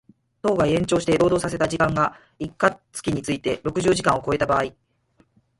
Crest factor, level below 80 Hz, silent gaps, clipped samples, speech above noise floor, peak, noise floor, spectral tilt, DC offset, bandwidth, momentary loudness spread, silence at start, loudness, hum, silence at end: 18 dB; -48 dBFS; none; under 0.1%; 41 dB; -4 dBFS; -62 dBFS; -5.5 dB/octave; under 0.1%; 11.5 kHz; 8 LU; 0.45 s; -22 LUFS; none; 0.9 s